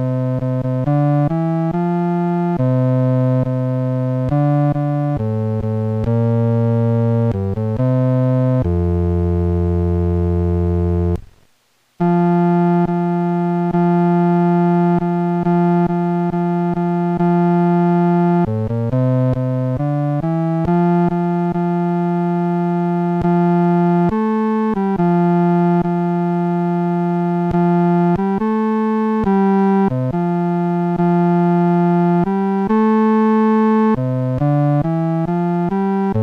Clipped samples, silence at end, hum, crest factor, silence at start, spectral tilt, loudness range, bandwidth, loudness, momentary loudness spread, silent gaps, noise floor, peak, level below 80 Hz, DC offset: under 0.1%; 0 s; none; 10 dB; 0 s; -11 dB/octave; 2 LU; 4.4 kHz; -17 LUFS; 4 LU; none; -59 dBFS; -6 dBFS; -42 dBFS; under 0.1%